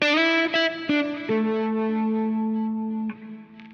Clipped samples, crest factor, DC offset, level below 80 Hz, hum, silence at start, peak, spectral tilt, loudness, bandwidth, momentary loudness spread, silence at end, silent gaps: under 0.1%; 16 dB; under 0.1%; -72 dBFS; none; 0 s; -10 dBFS; -5.5 dB/octave; -24 LUFS; 7 kHz; 13 LU; 0 s; none